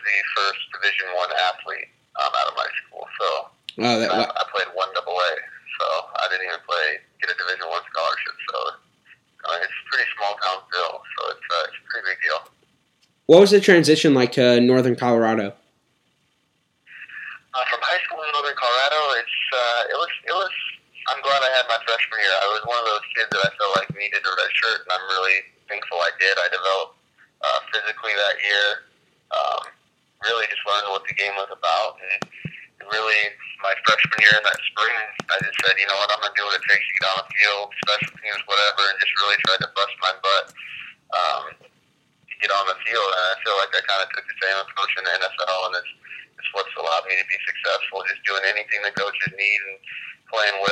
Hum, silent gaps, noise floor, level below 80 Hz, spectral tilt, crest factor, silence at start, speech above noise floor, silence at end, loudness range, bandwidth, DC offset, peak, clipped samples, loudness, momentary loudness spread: none; none; -68 dBFS; -74 dBFS; -3.5 dB/octave; 22 dB; 0 s; 46 dB; 0 s; 7 LU; 14.5 kHz; under 0.1%; 0 dBFS; under 0.1%; -21 LUFS; 12 LU